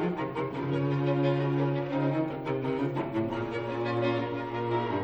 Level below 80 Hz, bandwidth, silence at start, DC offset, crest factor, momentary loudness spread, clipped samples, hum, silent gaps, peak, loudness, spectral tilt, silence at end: -60 dBFS; 6.2 kHz; 0 s; under 0.1%; 14 dB; 6 LU; under 0.1%; none; none; -16 dBFS; -30 LUFS; -9 dB/octave; 0 s